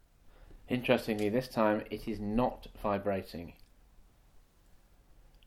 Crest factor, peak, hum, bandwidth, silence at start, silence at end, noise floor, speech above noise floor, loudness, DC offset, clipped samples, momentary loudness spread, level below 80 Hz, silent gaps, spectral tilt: 24 dB; -12 dBFS; none; 16 kHz; 0.25 s; 0.7 s; -62 dBFS; 29 dB; -33 LUFS; under 0.1%; under 0.1%; 10 LU; -54 dBFS; none; -6.5 dB/octave